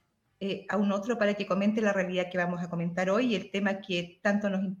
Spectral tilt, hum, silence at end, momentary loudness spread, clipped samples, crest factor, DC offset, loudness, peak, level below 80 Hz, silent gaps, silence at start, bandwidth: -6 dB/octave; none; 0 s; 6 LU; under 0.1%; 16 dB; under 0.1%; -29 LUFS; -14 dBFS; -72 dBFS; none; 0.4 s; 7.6 kHz